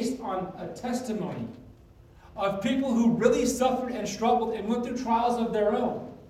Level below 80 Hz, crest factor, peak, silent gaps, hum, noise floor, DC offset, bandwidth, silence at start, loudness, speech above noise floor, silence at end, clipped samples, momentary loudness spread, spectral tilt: -54 dBFS; 20 dB; -8 dBFS; none; none; -53 dBFS; under 0.1%; 15 kHz; 0 s; -27 LUFS; 26 dB; 0 s; under 0.1%; 11 LU; -5 dB/octave